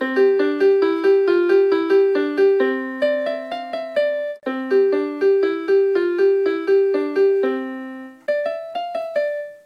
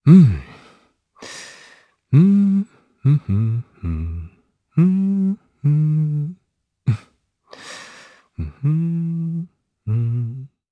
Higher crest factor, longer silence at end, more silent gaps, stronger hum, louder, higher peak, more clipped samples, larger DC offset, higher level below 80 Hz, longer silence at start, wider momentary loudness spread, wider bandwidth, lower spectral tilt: second, 12 dB vs 18 dB; second, 0.1 s vs 0.25 s; neither; neither; about the same, -19 LUFS vs -19 LUFS; second, -6 dBFS vs 0 dBFS; neither; neither; second, -76 dBFS vs -42 dBFS; about the same, 0 s vs 0.05 s; second, 10 LU vs 22 LU; second, 5.2 kHz vs 9.4 kHz; second, -5 dB/octave vs -9 dB/octave